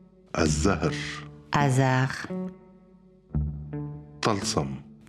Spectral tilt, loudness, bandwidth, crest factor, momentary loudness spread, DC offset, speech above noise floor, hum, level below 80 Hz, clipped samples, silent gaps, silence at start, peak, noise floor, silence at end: -5 dB/octave; -27 LUFS; 13 kHz; 20 dB; 13 LU; under 0.1%; 29 dB; 50 Hz at -55 dBFS; -42 dBFS; under 0.1%; none; 0.35 s; -8 dBFS; -55 dBFS; 0.15 s